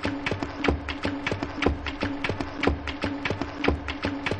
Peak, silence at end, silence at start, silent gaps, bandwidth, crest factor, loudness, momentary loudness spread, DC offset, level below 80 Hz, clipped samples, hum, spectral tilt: -8 dBFS; 0 s; 0 s; none; 9.8 kHz; 20 dB; -29 LUFS; 3 LU; under 0.1%; -38 dBFS; under 0.1%; none; -6 dB/octave